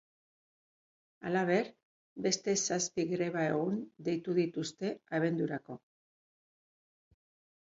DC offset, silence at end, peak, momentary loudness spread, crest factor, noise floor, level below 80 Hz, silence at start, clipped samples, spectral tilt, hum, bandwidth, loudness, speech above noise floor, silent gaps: under 0.1%; 1.9 s; -16 dBFS; 12 LU; 20 dB; under -90 dBFS; -78 dBFS; 1.2 s; under 0.1%; -4.5 dB/octave; none; 7.8 kHz; -34 LUFS; over 57 dB; 1.83-2.16 s